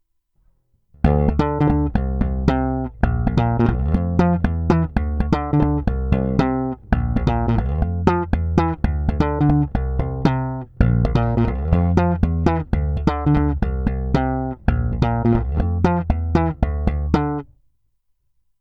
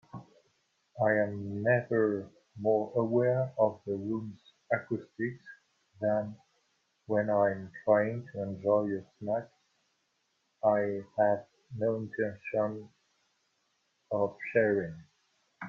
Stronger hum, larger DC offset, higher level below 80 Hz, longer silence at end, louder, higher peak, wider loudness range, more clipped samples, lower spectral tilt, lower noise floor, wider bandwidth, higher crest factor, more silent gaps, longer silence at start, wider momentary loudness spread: neither; neither; first, -24 dBFS vs -74 dBFS; first, 1.15 s vs 0 s; first, -20 LUFS vs -31 LUFS; first, 0 dBFS vs -12 dBFS; second, 1 LU vs 4 LU; neither; about the same, -9.5 dB/octave vs -9.5 dB/octave; second, -66 dBFS vs -77 dBFS; about the same, 6.6 kHz vs 6.8 kHz; about the same, 18 dB vs 20 dB; neither; first, 1.05 s vs 0.15 s; second, 5 LU vs 11 LU